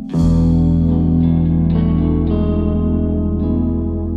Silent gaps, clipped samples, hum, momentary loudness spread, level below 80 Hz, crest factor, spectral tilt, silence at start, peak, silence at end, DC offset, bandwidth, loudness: none; under 0.1%; 50 Hz at -55 dBFS; 4 LU; -24 dBFS; 10 dB; -10.5 dB/octave; 0 s; -4 dBFS; 0 s; under 0.1%; 4.7 kHz; -16 LUFS